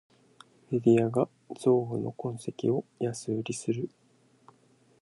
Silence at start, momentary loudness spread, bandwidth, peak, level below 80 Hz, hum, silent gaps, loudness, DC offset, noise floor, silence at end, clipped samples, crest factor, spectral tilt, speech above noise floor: 0.7 s; 11 LU; 11.5 kHz; -10 dBFS; -72 dBFS; none; none; -30 LUFS; under 0.1%; -63 dBFS; 1.15 s; under 0.1%; 20 dB; -7 dB/octave; 35 dB